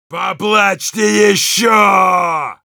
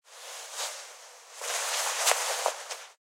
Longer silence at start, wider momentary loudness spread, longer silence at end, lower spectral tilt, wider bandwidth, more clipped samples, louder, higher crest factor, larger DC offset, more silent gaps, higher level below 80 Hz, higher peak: about the same, 0.1 s vs 0.05 s; second, 9 LU vs 18 LU; about the same, 0.2 s vs 0.1 s; first, -2.5 dB/octave vs 7 dB/octave; first, over 20 kHz vs 16 kHz; neither; first, -12 LUFS vs -29 LUFS; second, 12 dB vs 28 dB; neither; neither; first, -66 dBFS vs under -90 dBFS; first, 0 dBFS vs -6 dBFS